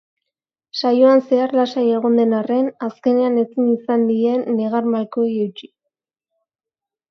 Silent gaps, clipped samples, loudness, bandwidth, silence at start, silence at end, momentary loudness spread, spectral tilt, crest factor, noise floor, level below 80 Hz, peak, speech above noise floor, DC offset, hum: none; under 0.1%; -18 LUFS; 6.4 kHz; 0.75 s; 1.45 s; 9 LU; -7 dB/octave; 16 dB; -88 dBFS; -72 dBFS; -2 dBFS; 71 dB; under 0.1%; none